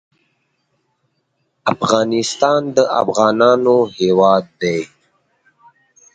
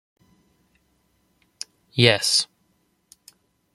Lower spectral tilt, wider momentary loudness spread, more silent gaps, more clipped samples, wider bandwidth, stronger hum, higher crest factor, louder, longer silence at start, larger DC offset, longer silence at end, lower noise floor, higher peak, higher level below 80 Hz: first, -4.5 dB/octave vs -3 dB/octave; second, 9 LU vs 22 LU; neither; neither; second, 9.4 kHz vs 15 kHz; neither; second, 16 dB vs 26 dB; first, -15 LUFS vs -19 LUFS; second, 1.65 s vs 1.95 s; neither; about the same, 1.3 s vs 1.3 s; about the same, -68 dBFS vs -67 dBFS; about the same, 0 dBFS vs -2 dBFS; about the same, -58 dBFS vs -62 dBFS